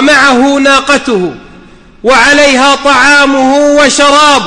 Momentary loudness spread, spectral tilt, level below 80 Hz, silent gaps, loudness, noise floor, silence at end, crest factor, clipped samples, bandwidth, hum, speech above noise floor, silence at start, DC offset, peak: 7 LU; -2 dB/octave; -36 dBFS; none; -5 LUFS; -34 dBFS; 0 s; 6 dB; 0.5%; 11.5 kHz; none; 29 dB; 0 s; under 0.1%; 0 dBFS